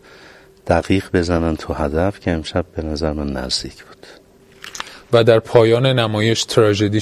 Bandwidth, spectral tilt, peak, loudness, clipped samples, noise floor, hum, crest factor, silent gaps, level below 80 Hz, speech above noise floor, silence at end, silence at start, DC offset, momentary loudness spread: 14 kHz; -5.5 dB/octave; 0 dBFS; -17 LUFS; under 0.1%; -44 dBFS; none; 18 dB; none; -34 dBFS; 28 dB; 0 s; 0.65 s; under 0.1%; 17 LU